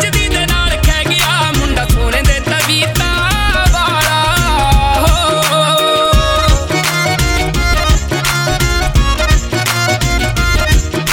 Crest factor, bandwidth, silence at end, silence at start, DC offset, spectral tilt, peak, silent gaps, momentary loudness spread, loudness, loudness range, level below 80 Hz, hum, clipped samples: 12 dB; 17.5 kHz; 0 s; 0 s; 0.3%; -3.5 dB/octave; 0 dBFS; none; 3 LU; -12 LUFS; 2 LU; -16 dBFS; none; under 0.1%